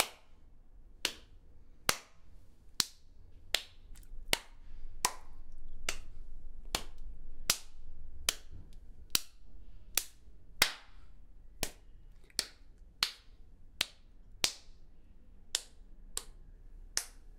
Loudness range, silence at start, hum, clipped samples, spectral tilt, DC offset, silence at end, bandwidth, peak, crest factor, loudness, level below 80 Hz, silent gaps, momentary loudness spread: 3 LU; 0 s; none; under 0.1%; 0 dB/octave; under 0.1%; 0 s; 16 kHz; -4 dBFS; 34 dB; -36 LUFS; -48 dBFS; none; 22 LU